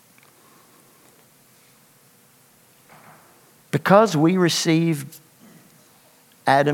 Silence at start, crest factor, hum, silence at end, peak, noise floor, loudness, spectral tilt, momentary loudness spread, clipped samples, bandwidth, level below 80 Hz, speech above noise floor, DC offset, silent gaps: 3.75 s; 24 dB; none; 0 s; 0 dBFS; -55 dBFS; -19 LUFS; -5 dB/octave; 13 LU; under 0.1%; 17.5 kHz; -76 dBFS; 37 dB; under 0.1%; none